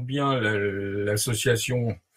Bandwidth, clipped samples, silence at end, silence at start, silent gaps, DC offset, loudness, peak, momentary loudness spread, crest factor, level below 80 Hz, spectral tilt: 16.5 kHz; under 0.1%; 0.2 s; 0 s; none; under 0.1%; -25 LUFS; -10 dBFS; 5 LU; 14 dB; -54 dBFS; -4.5 dB/octave